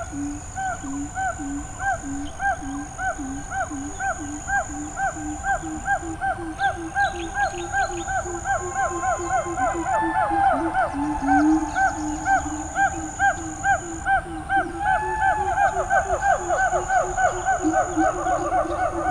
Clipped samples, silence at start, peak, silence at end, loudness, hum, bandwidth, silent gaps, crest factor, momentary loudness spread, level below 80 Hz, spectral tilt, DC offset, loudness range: under 0.1%; 0 s; -8 dBFS; 0 s; -24 LUFS; none; 11 kHz; none; 16 dB; 8 LU; -40 dBFS; -4.5 dB/octave; under 0.1%; 6 LU